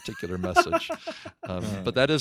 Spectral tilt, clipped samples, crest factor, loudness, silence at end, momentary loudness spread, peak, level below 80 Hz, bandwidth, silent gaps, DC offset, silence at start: -5 dB/octave; under 0.1%; 24 dB; -27 LUFS; 0 s; 13 LU; -4 dBFS; -52 dBFS; 15.5 kHz; none; under 0.1%; 0 s